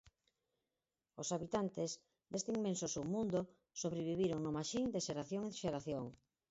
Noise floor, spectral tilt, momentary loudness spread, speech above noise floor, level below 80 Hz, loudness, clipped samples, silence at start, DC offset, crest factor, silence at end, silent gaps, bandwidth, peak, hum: under -90 dBFS; -6 dB/octave; 8 LU; over 49 dB; -70 dBFS; -41 LUFS; under 0.1%; 0.05 s; under 0.1%; 18 dB; 0.35 s; none; 8 kHz; -24 dBFS; none